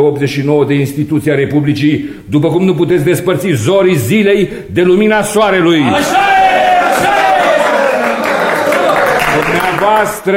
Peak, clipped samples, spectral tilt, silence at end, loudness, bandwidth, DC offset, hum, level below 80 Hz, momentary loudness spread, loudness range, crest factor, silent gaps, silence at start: 0 dBFS; under 0.1%; -5.5 dB/octave; 0 s; -10 LUFS; 16.5 kHz; under 0.1%; none; -42 dBFS; 4 LU; 3 LU; 10 dB; none; 0 s